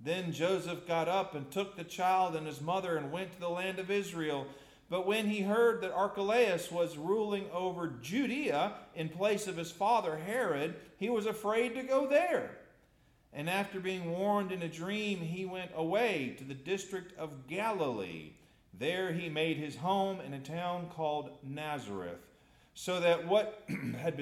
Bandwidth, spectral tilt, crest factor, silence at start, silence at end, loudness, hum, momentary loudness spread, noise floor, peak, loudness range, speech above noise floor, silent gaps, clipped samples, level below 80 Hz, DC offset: 15.5 kHz; -5 dB/octave; 18 dB; 0 s; 0 s; -34 LUFS; none; 11 LU; -67 dBFS; -16 dBFS; 4 LU; 33 dB; none; under 0.1%; -72 dBFS; under 0.1%